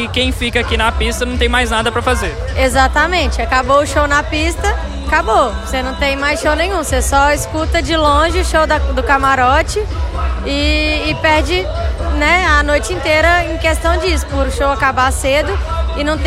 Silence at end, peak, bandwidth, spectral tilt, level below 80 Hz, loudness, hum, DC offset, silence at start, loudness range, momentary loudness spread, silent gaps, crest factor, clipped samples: 0 s; 0 dBFS; 14 kHz; -4.5 dB/octave; -20 dBFS; -14 LUFS; none; under 0.1%; 0 s; 1 LU; 7 LU; none; 14 dB; under 0.1%